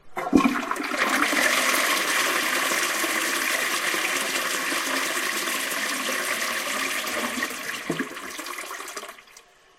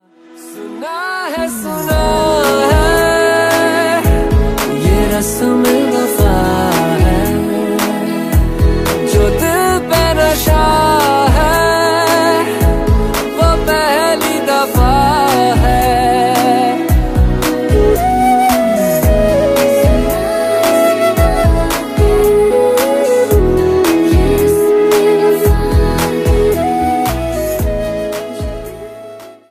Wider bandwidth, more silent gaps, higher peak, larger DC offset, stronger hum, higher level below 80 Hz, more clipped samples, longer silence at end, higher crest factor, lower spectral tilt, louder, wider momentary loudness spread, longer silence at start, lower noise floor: about the same, 16 kHz vs 15.5 kHz; neither; about the same, -2 dBFS vs 0 dBFS; neither; neither; second, -60 dBFS vs -18 dBFS; neither; first, 0.4 s vs 0.2 s; first, 22 dB vs 12 dB; second, -1 dB/octave vs -5.5 dB/octave; second, -24 LUFS vs -12 LUFS; first, 12 LU vs 7 LU; second, 0.05 s vs 0.35 s; first, -52 dBFS vs -37 dBFS